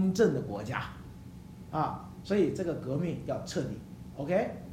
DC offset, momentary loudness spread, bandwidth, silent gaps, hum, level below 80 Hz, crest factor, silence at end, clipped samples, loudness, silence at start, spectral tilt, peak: under 0.1%; 19 LU; 15.5 kHz; none; none; -56 dBFS; 20 dB; 0 s; under 0.1%; -32 LUFS; 0 s; -7 dB/octave; -12 dBFS